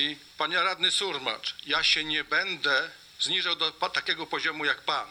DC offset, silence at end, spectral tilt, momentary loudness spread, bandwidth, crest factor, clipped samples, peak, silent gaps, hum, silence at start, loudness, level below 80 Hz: under 0.1%; 0 s; -1 dB/octave; 7 LU; 19.5 kHz; 18 dB; under 0.1%; -10 dBFS; none; none; 0 s; -26 LUFS; -64 dBFS